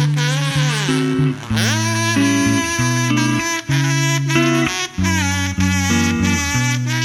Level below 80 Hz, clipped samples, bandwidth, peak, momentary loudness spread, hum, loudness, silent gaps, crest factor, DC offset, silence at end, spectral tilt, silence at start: -40 dBFS; under 0.1%; 16 kHz; -2 dBFS; 3 LU; none; -17 LUFS; none; 14 dB; under 0.1%; 0 s; -4 dB/octave; 0 s